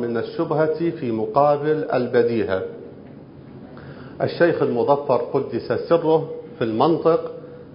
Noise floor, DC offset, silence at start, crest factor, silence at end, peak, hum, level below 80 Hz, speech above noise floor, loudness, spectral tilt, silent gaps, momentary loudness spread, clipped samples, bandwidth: -41 dBFS; under 0.1%; 0 s; 18 dB; 0 s; -4 dBFS; none; -56 dBFS; 21 dB; -21 LUFS; -11.5 dB/octave; none; 21 LU; under 0.1%; 5.4 kHz